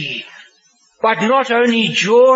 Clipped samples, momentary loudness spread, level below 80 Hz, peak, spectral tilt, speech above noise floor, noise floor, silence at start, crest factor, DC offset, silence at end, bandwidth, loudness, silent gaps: under 0.1%; 10 LU; -68 dBFS; -2 dBFS; -4 dB/octave; 42 dB; -55 dBFS; 0 s; 14 dB; under 0.1%; 0 s; 8 kHz; -14 LUFS; none